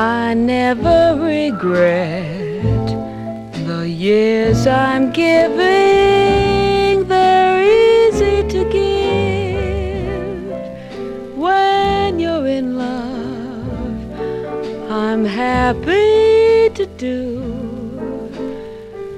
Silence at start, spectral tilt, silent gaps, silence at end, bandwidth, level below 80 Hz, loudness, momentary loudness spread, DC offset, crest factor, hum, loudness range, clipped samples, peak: 0 s; -6.5 dB/octave; none; 0 s; 12 kHz; -34 dBFS; -15 LUFS; 15 LU; under 0.1%; 14 dB; none; 7 LU; under 0.1%; -2 dBFS